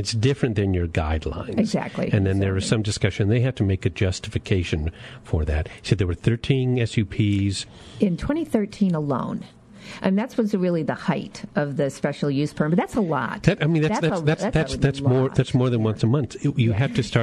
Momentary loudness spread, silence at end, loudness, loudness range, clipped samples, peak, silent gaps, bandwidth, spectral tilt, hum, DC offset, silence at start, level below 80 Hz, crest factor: 6 LU; 0 s; -23 LUFS; 3 LU; under 0.1%; -4 dBFS; none; 12 kHz; -6.5 dB/octave; none; under 0.1%; 0 s; -40 dBFS; 18 dB